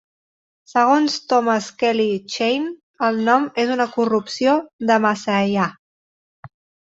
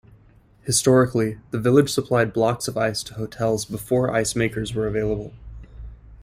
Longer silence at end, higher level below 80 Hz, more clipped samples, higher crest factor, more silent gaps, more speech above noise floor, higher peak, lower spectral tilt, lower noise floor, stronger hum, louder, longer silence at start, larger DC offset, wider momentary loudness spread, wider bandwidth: first, 0.4 s vs 0 s; second, -64 dBFS vs -44 dBFS; neither; about the same, 18 dB vs 18 dB; first, 2.83-2.94 s, 4.73-4.79 s, 5.79-6.43 s vs none; first, over 72 dB vs 32 dB; about the same, -2 dBFS vs -4 dBFS; about the same, -4.5 dB/octave vs -5 dB/octave; first, under -90 dBFS vs -53 dBFS; neither; first, -19 LUFS vs -22 LUFS; about the same, 0.75 s vs 0.65 s; neither; second, 6 LU vs 17 LU; second, 8 kHz vs 16 kHz